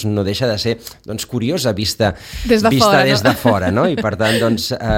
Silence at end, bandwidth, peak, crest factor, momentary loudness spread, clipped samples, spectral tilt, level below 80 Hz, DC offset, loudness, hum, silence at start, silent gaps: 0 s; 17 kHz; 0 dBFS; 16 dB; 11 LU; under 0.1%; -5 dB/octave; -36 dBFS; under 0.1%; -15 LUFS; none; 0 s; none